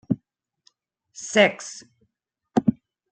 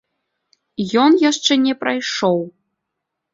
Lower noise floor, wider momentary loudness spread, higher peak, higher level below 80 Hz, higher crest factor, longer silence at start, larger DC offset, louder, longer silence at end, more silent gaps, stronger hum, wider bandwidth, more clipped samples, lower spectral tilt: about the same, -78 dBFS vs -79 dBFS; first, 19 LU vs 13 LU; about the same, -4 dBFS vs -2 dBFS; about the same, -64 dBFS vs -64 dBFS; first, 22 dB vs 16 dB; second, 0.1 s vs 0.8 s; neither; second, -22 LUFS vs -17 LUFS; second, 0.4 s vs 0.85 s; neither; neither; first, 9.2 kHz vs 7.8 kHz; neither; about the same, -4.5 dB/octave vs -4 dB/octave